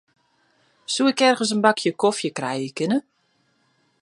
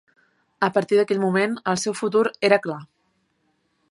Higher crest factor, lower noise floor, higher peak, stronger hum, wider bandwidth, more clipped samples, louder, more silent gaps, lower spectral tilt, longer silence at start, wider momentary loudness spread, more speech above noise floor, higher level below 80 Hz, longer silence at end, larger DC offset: about the same, 22 dB vs 22 dB; about the same, -66 dBFS vs -69 dBFS; about the same, -2 dBFS vs -2 dBFS; neither; about the same, 11.5 kHz vs 11.5 kHz; neither; about the same, -21 LUFS vs -21 LUFS; neither; about the same, -3.5 dB/octave vs -4.5 dB/octave; first, 0.9 s vs 0.6 s; first, 9 LU vs 5 LU; about the same, 46 dB vs 48 dB; second, -76 dBFS vs -70 dBFS; about the same, 1 s vs 1.05 s; neither